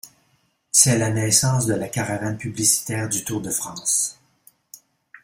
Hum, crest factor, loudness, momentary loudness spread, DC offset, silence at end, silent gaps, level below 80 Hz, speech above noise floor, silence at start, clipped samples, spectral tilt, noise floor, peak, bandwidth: none; 24 dB; -20 LUFS; 10 LU; under 0.1%; 0.05 s; none; -54 dBFS; 44 dB; 0.05 s; under 0.1%; -3 dB/octave; -65 dBFS; 0 dBFS; 16.5 kHz